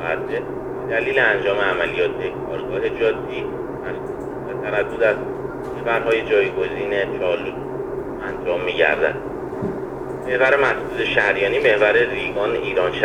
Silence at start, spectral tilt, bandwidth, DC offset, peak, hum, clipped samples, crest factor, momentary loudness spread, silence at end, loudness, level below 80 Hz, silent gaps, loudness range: 0 s; -6 dB/octave; 11 kHz; under 0.1%; -2 dBFS; none; under 0.1%; 20 dB; 12 LU; 0 s; -21 LUFS; -46 dBFS; none; 5 LU